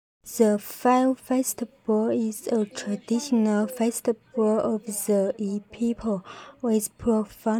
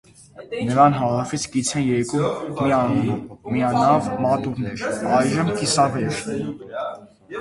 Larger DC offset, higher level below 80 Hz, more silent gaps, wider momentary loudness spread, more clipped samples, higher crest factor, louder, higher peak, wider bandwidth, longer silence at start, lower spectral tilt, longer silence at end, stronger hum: neither; second, -60 dBFS vs -52 dBFS; neither; second, 8 LU vs 13 LU; neither; about the same, 18 dB vs 20 dB; second, -25 LUFS vs -21 LUFS; second, -8 dBFS vs -2 dBFS; first, over 20 kHz vs 11.5 kHz; about the same, 0.25 s vs 0.35 s; about the same, -5.5 dB/octave vs -5.5 dB/octave; about the same, 0 s vs 0 s; neither